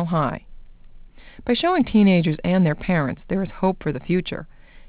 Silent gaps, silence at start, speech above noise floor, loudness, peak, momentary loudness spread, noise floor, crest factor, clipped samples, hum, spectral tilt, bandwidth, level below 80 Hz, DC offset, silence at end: none; 0 s; 22 dB; -21 LUFS; -6 dBFS; 12 LU; -42 dBFS; 14 dB; under 0.1%; none; -11.5 dB/octave; 4 kHz; -44 dBFS; under 0.1%; 0.1 s